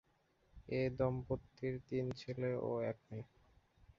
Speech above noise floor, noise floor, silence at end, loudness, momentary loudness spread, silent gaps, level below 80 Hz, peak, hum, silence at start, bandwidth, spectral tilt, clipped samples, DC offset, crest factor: 36 dB; -76 dBFS; 0.75 s; -41 LUFS; 12 LU; none; -62 dBFS; -24 dBFS; none; 0.55 s; 7.4 kHz; -7 dB/octave; under 0.1%; under 0.1%; 18 dB